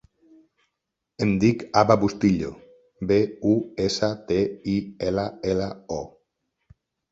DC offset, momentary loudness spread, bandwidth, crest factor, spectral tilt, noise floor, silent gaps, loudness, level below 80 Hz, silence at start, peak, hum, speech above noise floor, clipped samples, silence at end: under 0.1%; 13 LU; 8 kHz; 22 dB; -6.5 dB/octave; -82 dBFS; none; -24 LUFS; -50 dBFS; 1.2 s; -2 dBFS; none; 59 dB; under 0.1%; 1.05 s